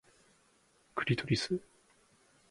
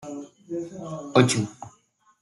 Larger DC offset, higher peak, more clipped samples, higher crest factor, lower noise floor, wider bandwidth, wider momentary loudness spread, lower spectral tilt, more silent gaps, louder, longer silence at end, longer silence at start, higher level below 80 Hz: neither; second, -16 dBFS vs -4 dBFS; neither; about the same, 22 dB vs 24 dB; first, -69 dBFS vs -62 dBFS; about the same, 11.5 kHz vs 12 kHz; second, 8 LU vs 22 LU; about the same, -5.5 dB/octave vs -5 dB/octave; neither; second, -35 LUFS vs -25 LUFS; first, 0.9 s vs 0.5 s; first, 0.95 s vs 0 s; about the same, -66 dBFS vs -64 dBFS